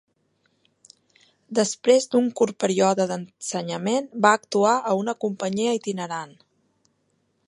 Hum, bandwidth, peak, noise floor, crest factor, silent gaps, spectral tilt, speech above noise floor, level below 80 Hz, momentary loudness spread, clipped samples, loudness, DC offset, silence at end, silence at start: none; 11.5 kHz; -2 dBFS; -70 dBFS; 22 dB; none; -4 dB/octave; 47 dB; -74 dBFS; 11 LU; under 0.1%; -23 LUFS; under 0.1%; 1.2 s; 1.5 s